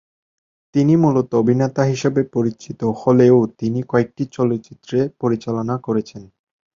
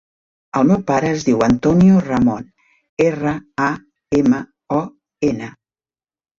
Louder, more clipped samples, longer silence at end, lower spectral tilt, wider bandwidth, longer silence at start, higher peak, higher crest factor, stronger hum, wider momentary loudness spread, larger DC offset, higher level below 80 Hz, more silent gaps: about the same, -18 LUFS vs -17 LUFS; neither; second, 0.5 s vs 0.9 s; about the same, -8 dB/octave vs -7.5 dB/octave; about the same, 7.6 kHz vs 7.6 kHz; first, 0.75 s vs 0.55 s; first, 0 dBFS vs -4 dBFS; about the same, 18 dB vs 14 dB; neither; second, 10 LU vs 15 LU; neither; second, -56 dBFS vs -46 dBFS; second, none vs 2.89-2.97 s